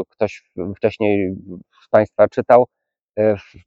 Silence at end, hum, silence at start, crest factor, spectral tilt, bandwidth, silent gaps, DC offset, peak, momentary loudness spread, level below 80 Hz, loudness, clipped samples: 0.25 s; none; 0 s; 18 dB; -8 dB/octave; 7.4 kHz; 3.01-3.08 s; under 0.1%; 0 dBFS; 15 LU; -56 dBFS; -18 LUFS; under 0.1%